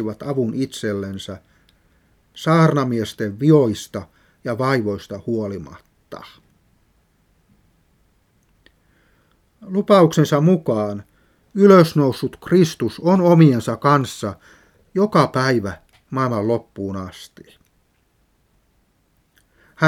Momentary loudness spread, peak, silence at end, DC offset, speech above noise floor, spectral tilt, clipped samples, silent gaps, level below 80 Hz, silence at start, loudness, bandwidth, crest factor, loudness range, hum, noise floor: 19 LU; 0 dBFS; 0 s; under 0.1%; 45 dB; -7 dB/octave; under 0.1%; none; -58 dBFS; 0 s; -18 LUFS; 15.5 kHz; 20 dB; 12 LU; none; -63 dBFS